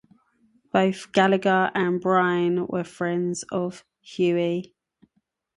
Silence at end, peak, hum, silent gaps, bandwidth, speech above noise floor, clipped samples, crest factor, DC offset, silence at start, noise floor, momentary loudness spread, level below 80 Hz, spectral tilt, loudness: 0.95 s; -6 dBFS; none; none; 11.5 kHz; 50 dB; under 0.1%; 20 dB; under 0.1%; 0.75 s; -73 dBFS; 9 LU; -68 dBFS; -6 dB/octave; -23 LUFS